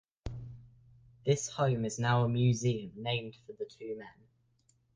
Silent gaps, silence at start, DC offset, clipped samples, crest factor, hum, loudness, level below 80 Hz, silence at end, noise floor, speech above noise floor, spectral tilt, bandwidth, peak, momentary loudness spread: none; 0.25 s; under 0.1%; under 0.1%; 18 dB; none; -32 LUFS; -58 dBFS; 0.85 s; -72 dBFS; 40 dB; -5.5 dB/octave; 9.8 kHz; -16 dBFS; 17 LU